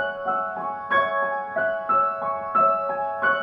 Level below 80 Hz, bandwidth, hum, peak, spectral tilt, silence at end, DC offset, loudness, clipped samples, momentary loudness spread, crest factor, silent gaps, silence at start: -64 dBFS; 5.4 kHz; none; -10 dBFS; -6 dB/octave; 0 s; under 0.1%; -23 LUFS; under 0.1%; 6 LU; 14 dB; none; 0 s